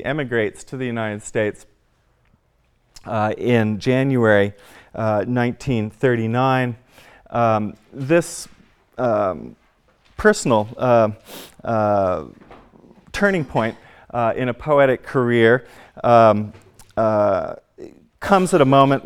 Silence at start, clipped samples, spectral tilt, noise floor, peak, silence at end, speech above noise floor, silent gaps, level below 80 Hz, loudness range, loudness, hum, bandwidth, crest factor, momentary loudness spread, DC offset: 0 s; under 0.1%; -6.5 dB/octave; -62 dBFS; 0 dBFS; 0.05 s; 44 dB; none; -50 dBFS; 5 LU; -19 LUFS; none; 17 kHz; 20 dB; 16 LU; under 0.1%